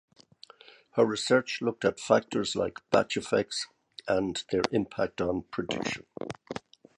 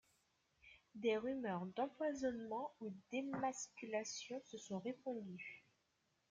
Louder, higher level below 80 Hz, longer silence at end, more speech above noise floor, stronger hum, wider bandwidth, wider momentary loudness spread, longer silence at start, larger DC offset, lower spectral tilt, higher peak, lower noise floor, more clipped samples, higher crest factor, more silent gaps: first, -29 LUFS vs -45 LUFS; first, -60 dBFS vs -82 dBFS; second, 0.4 s vs 0.7 s; second, 27 dB vs 39 dB; neither; first, 11.5 kHz vs 9.6 kHz; first, 14 LU vs 11 LU; first, 0.95 s vs 0.65 s; neither; about the same, -4.5 dB/octave vs -4.5 dB/octave; first, -4 dBFS vs -28 dBFS; second, -55 dBFS vs -83 dBFS; neither; first, 26 dB vs 18 dB; neither